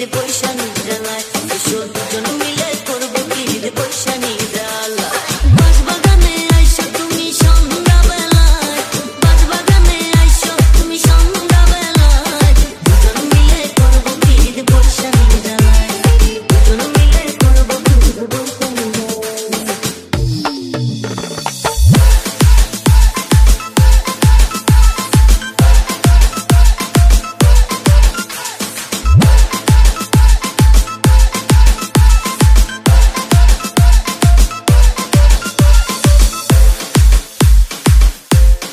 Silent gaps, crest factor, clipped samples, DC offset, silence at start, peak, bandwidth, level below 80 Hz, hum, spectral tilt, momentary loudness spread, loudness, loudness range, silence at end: none; 10 dB; 0.3%; under 0.1%; 0 s; 0 dBFS; 15.5 kHz; -10 dBFS; none; -4.5 dB/octave; 8 LU; -12 LUFS; 6 LU; 0 s